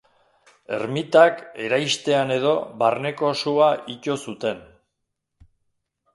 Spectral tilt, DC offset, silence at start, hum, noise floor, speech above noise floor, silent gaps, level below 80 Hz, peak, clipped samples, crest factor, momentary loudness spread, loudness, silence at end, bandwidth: -4.5 dB/octave; under 0.1%; 0.7 s; none; -79 dBFS; 57 dB; none; -66 dBFS; -2 dBFS; under 0.1%; 22 dB; 12 LU; -21 LUFS; 1.55 s; 11.5 kHz